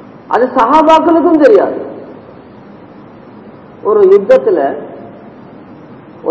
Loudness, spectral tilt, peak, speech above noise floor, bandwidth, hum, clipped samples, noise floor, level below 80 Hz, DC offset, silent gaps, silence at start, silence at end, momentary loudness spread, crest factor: -9 LUFS; -6.5 dB/octave; 0 dBFS; 27 dB; 8 kHz; none; 2%; -34 dBFS; -50 dBFS; under 0.1%; none; 0.3 s; 0 s; 19 LU; 12 dB